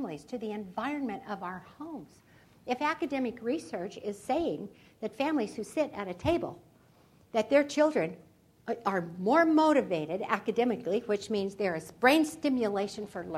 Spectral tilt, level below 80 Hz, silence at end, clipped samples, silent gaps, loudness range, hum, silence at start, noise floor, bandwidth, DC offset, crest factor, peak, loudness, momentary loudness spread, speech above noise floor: -5.5 dB/octave; -62 dBFS; 0 s; under 0.1%; none; 7 LU; none; 0 s; -61 dBFS; 15 kHz; under 0.1%; 22 dB; -10 dBFS; -30 LUFS; 16 LU; 31 dB